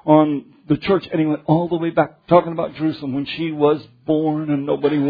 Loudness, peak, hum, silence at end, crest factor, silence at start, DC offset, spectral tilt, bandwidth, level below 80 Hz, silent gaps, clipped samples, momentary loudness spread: -19 LUFS; 0 dBFS; none; 0 s; 18 dB; 0.05 s; under 0.1%; -10 dB/octave; 5 kHz; -56 dBFS; none; under 0.1%; 8 LU